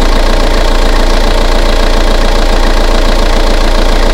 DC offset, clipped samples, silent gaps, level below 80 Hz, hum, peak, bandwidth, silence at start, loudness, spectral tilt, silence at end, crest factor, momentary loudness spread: under 0.1%; 2%; none; -8 dBFS; none; 0 dBFS; 12.5 kHz; 0 s; -11 LUFS; -4.5 dB/octave; 0 s; 6 dB; 0 LU